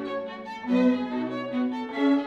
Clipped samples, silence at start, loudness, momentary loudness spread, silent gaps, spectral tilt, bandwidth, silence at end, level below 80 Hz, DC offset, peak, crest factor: under 0.1%; 0 s; -27 LUFS; 11 LU; none; -7 dB/octave; 6.6 kHz; 0 s; -68 dBFS; under 0.1%; -12 dBFS; 14 dB